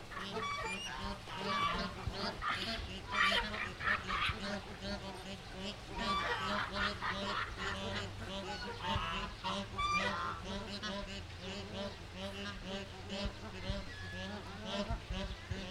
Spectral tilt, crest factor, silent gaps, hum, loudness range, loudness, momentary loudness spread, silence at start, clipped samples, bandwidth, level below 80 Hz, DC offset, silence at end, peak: -4 dB/octave; 22 dB; none; none; 7 LU; -39 LUFS; 10 LU; 0 s; under 0.1%; 16 kHz; -50 dBFS; under 0.1%; 0 s; -18 dBFS